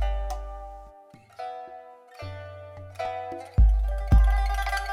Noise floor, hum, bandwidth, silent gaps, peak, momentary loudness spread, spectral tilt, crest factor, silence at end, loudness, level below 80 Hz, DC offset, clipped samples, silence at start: -51 dBFS; none; 11 kHz; none; -10 dBFS; 21 LU; -6.5 dB/octave; 16 dB; 0 s; -27 LUFS; -26 dBFS; under 0.1%; under 0.1%; 0 s